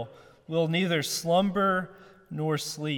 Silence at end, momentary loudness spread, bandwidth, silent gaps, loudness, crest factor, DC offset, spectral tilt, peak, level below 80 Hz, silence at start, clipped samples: 0 s; 14 LU; 17.5 kHz; none; -27 LUFS; 16 dB; under 0.1%; -4.5 dB/octave; -12 dBFS; -64 dBFS; 0 s; under 0.1%